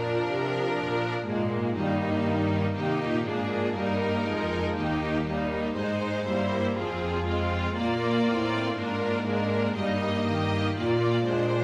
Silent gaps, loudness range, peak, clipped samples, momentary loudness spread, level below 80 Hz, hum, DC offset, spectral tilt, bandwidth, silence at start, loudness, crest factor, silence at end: none; 1 LU; -14 dBFS; under 0.1%; 4 LU; -50 dBFS; none; under 0.1%; -7 dB/octave; 10 kHz; 0 s; -27 LUFS; 12 dB; 0 s